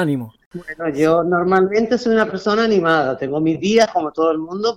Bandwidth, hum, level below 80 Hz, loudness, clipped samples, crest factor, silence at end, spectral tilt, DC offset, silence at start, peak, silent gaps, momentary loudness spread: 12 kHz; none; -54 dBFS; -17 LUFS; under 0.1%; 14 dB; 0 s; -6 dB/octave; under 0.1%; 0 s; -4 dBFS; 0.46-0.51 s; 10 LU